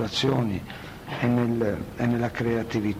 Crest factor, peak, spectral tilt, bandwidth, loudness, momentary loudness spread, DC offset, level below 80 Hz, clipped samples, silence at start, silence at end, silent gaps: 16 dB; -8 dBFS; -6.5 dB/octave; 16 kHz; -26 LUFS; 11 LU; under 0.1%; -48 dBFS; under 0.1%; 0 s; 0 s; none